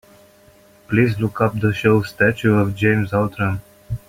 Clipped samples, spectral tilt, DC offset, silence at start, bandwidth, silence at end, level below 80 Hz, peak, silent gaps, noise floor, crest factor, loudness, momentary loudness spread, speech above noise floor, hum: under 0.1%; -7.5 dB/octave; under 0.1%; 0.9 s; 16 kHz; 0.1 s; -46 dBFS; -2 dBFS; none; -50 dBFS; 16 dB; -18 LUFS; 7 LU; 32 dB; none